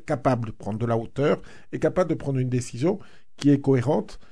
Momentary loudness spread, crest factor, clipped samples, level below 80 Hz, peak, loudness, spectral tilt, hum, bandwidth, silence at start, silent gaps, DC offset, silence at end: 8 LU; 16 dB; under 0.1%; -50 dBFS; -8 dBFS; -25 LUFS; -7.5 dB/octave; none; 11 kHz; 0.1 s; none; 0.9%; 0.1 s